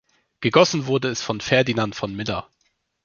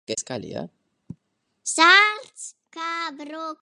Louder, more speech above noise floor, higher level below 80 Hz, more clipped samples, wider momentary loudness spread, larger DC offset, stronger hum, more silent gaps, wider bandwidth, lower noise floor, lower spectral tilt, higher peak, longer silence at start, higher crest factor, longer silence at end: about the same, -21 LUFS vs -19 LUFS; about the same, 49 dB vs 52 dB; first, -54 dBFS vs -68 dBFS; neither; second, 11 LU vs 24 LU; neither; neither; neither; second, 7.4 kHz vs 11.5 kHz; second, -70 dBFS vs -74 dBFS; first, -4.5 dB/octave vs -1 dB/octave; about the same, -2 dBFS vs -2 dBFS; first, 0.4 s vs 0.1 s; about the same, 20 dB vs 22 dB; first, 0.6 s vs 0.1 s